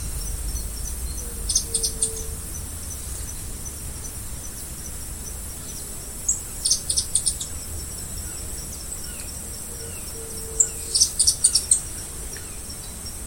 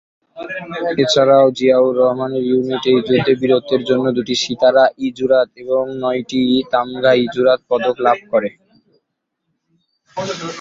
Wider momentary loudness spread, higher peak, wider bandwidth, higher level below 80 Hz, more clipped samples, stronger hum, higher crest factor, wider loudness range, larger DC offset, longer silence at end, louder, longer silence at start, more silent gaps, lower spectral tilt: about the same, 14 LU vs 12 LU; about the same, 0 dBFS vs -2 dBFS; first, 17 kHz vs 7.8 kHz; first, -36 dBFS vs -56 dBFS; neither; neither; first, 28 dB vs 14 dB; first, 11 LU vs 4 LU; neither; about the same, 0 s vs 0 s; second, -25 LUFS vs -15 LUFS; second, 0 s vs 0.35 s; neither; second, -1 dB/octave vs -5 dB/octave